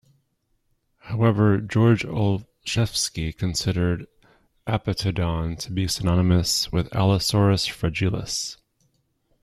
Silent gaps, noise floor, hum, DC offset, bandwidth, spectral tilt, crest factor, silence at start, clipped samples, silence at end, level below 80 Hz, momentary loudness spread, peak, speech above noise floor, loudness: none; -70 dBFS; none; under 0.1%; 14.5 kHz; -5 dB/octave; 16 dB; 1.05 s; under 0.1%; 0.9 s; -44 dBFS; 8 LU; -6 dBFS; 48 dB; -23 LUFS